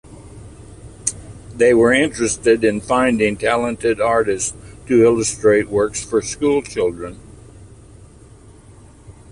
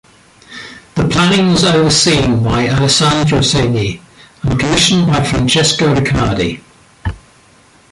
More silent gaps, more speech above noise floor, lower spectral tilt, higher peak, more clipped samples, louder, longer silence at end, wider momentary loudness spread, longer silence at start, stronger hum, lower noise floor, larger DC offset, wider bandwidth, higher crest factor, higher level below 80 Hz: neither; second, 27 dB vs 34 dB; about the same, -4 dB/octave vs -4.5 dB/octave; about the same, 0 dBFS vs 0 dBFS; neither; second, -17 LUFS vs -12 LUFS; second, 0.2 s vs 0.75 s; second, 11 LU vs 16 LU; second, 0.1 s vs 0.5 s; neither; about the same, -43 dBFS vs -46 dBFS; neither; about the same, 11.5 kHz vs 11.5 kHz; about the same, 18 dB vs 14 dB; second, -44 dBFS vs -32 dBFS